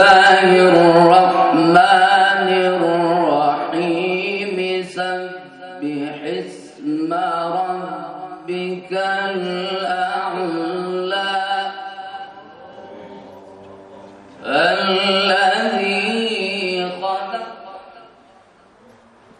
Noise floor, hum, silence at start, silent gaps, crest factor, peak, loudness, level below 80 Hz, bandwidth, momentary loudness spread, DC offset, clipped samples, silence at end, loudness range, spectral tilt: -50 dBFS; none; 0 s; none; 18 dB; 0 dBFS; -16 LUFS; -64 dBFS; 10.5 kHz; 21 LU; under 0.1%; under 0.1%; 1.4 s; 11 LU; -5 dB/octave